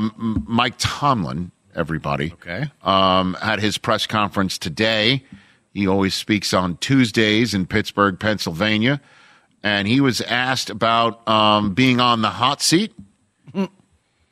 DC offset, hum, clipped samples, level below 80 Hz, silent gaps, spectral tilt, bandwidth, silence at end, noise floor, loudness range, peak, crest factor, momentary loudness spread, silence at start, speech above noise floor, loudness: under 0.1%; none; under 0.1%; -48 dBFS; none; -4.5 dB/octave; 15.5 kHz; 0.65 s; -62 dBFS; 3 LU; -2 dBFS; 18 dB; 11 LU; 0 s; 43 dB; -19 LUFS